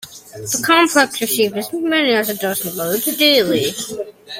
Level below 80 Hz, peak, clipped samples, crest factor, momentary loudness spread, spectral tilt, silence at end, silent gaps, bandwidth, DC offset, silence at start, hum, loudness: -60 dBFS; 0 dBFS; under 0.1%; 16 dB; 13 LU; -2.5 dB/octave; 0 s; none; 16.5 kHz; under 0.1%; 0 s; none; -16 LUFS